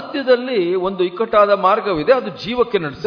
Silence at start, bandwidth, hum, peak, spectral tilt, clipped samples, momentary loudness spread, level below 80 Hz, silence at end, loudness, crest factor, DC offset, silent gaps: 0 s; 5.4 kHz; none; -2 dBFS; -7 dB/octave; under 0.1%; 7 LU; -52 dBFS; 0 s; -17 LUFS; 16 dB; under 0.1%; none